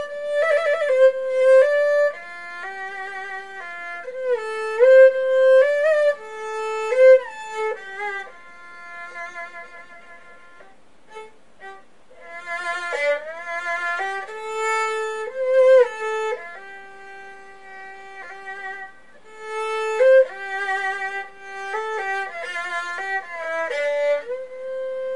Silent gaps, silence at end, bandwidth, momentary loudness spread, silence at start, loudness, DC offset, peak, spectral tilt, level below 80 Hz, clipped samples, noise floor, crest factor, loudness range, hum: none; 0 s; 11 kHz; 24 LU; 0 s; -20 LUFS; 0.5%; -4 dBFS; -1 dB/octave; -70 dBFS; under 0.1%; -53 dBFS; 18 dB; 17 LU; none